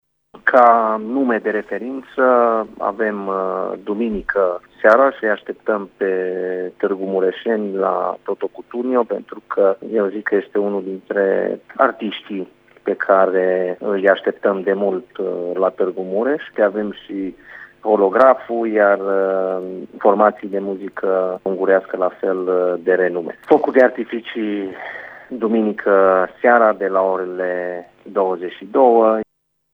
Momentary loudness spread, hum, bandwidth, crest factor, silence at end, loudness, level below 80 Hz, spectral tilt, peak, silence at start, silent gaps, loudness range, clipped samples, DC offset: 13 LU; none; 5.4 kHz; 18 dB; 0.5 s; -18 LUFS; -58 dBFS; -8 dB/octave; 0 dBFS; 0.35 s; none; 4 LU; under 0.1%; under 0.1%